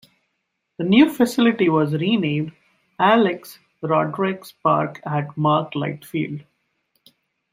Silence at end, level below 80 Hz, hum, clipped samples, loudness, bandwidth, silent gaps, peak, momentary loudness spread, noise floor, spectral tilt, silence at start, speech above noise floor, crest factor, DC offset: 1.1 s; -64 dBFS; none; under 0.1%; -20 LUFS; 16 kHz; none; -2 dBFS; 12 LU; -75 dBFS; -6.5 dB/octave; 0.8 s; 56 dB; 18 dB; under 0.1%